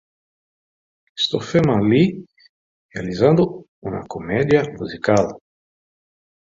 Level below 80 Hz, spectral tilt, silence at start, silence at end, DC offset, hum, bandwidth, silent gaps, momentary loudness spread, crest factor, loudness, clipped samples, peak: -50 dBFS; -6.5 dB/octave; 1.15 s; 1.1 s; under 0.1%; none; 7.8 kHz; 2.49-2.89 s, 3.68-3.82 s; 15 LU; 20 dB; -19 LUFS; under 0.1%; -2 dBFS